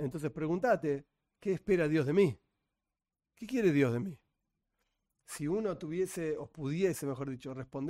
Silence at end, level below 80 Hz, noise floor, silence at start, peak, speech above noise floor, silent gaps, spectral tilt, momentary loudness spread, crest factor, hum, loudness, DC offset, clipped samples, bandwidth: 0 s; -64 dBFS; under -90 dBFS; 0 s; -16 dBFS; over 57 dB; none; -7 dB/octave; 12 LU; 18 dB; none; -33 LUFS; under 0.1%; under 0.1%; 16 kHz